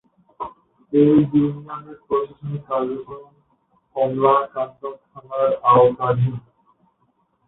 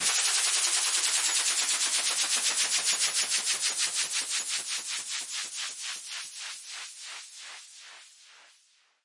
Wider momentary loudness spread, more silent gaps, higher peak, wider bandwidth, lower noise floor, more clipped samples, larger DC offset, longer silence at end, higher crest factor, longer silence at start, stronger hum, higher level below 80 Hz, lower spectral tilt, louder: first, 20 LU vs 17 LU; neither; first, -4 dBFS vs -12 dBFS; second, 4 kHz vs 11.5 kHz; about the same, -66 dBFS vs -65 dBFS; neither; neither; first, 1.1 s vs 0.65 s; about the same, 18 dB vs 18 dB; first, 0.4 s vs 0 s; neither; first, -58 dBFS vs -84 dBFS; first, -13 dB/octave vs 4 dB/octave; first, -19 LUFS vs -26 LUFS